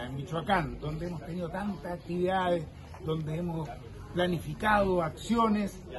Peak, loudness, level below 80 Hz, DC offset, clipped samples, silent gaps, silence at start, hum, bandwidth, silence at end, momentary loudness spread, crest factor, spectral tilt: -12 dBFS; -31 LUFS; -48 dBFS; under 0.1%; under 0.1%; none; 0 s; none; 12.5 kHz; 0 s; 11 LU; 20 dB; -6.5 dB/octave